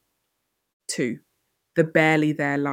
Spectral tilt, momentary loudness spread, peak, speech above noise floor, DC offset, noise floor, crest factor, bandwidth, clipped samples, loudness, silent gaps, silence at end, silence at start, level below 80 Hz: -5.5 dB/octave; 16 LU; -4 dBFS; 55 dB; under 0.1%; -77 dBFS; 20 dB; 16 kHz; under 0.1%; -22 LUFS; none; 0 s; 0.9 s; -70 dBFS